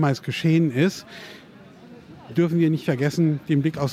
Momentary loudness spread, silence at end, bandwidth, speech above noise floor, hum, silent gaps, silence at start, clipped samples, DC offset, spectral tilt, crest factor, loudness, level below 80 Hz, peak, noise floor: 17 LU; 0 s; 14.5 kHz; 24 dB; none; none; 0 s; under 0.1%; under 0.1%; -7 dB/octave; 16 dB; -22 LUFS; -62 dBFS; -8 dBFS; -46 dBFS